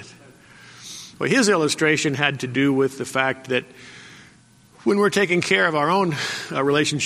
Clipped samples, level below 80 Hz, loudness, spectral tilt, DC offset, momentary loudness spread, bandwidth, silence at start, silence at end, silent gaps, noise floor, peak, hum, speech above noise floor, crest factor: under 0.1%; -64 dBFS; -20 LUFS; -4 dB/octave; under 0.1%; 18 LU; 14.5 kHz; 0 s; 0 s; none; -52 dBFS; -2 dBFS; none; 32 dB; 20 dB